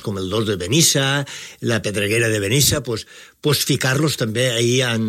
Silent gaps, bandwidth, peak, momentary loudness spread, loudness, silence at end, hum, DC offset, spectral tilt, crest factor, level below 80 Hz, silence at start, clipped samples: none; 16.5 kHz; -2 dBFS; 11 LU; -18 LUFS; 0 s; none; under 0.1%; -3.5 dB/octave; 18 dB; -48 dBFS; 0 s; under 0.1%